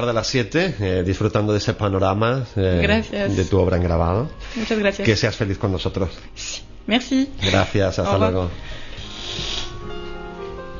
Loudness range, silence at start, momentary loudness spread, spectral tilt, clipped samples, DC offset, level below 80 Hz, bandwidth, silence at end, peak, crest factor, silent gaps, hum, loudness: 2 LU; 0 s; 14 LU; -5.5 dB/octave; under 0.1%; under 0.1%; -36 dBFS; 7.4 kHz; 0 s; -4 dBFS; 16 dB; none; none; -21 LUFS